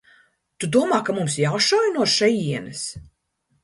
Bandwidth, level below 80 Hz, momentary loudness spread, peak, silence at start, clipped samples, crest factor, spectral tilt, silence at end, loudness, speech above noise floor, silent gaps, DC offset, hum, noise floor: 11.5 kHz; -58 dBFS; 12 LU; -6 dBFS; 0.6 s; under 0.1%; 18 dB; -4 dB/octave; 0.6 s; -21 LUFS; 49 dB; none; under 0.1%; none; -70 dBFS